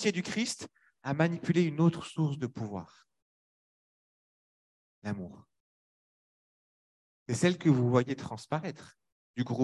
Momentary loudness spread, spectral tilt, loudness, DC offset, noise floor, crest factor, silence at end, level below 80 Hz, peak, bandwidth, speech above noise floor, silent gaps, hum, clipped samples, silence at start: 17 LU; -6 dB/octave; -31 LUFS; under 0.1%; under -90 dBFS; 22 dB; 0 s; -68 dBFS; -12 dBFS; 12 kHz; over 60 dB; 3.22-5.02 s, 5.60-7.26 s, 9.12-9.34 s; none; under 0.1%; 0 s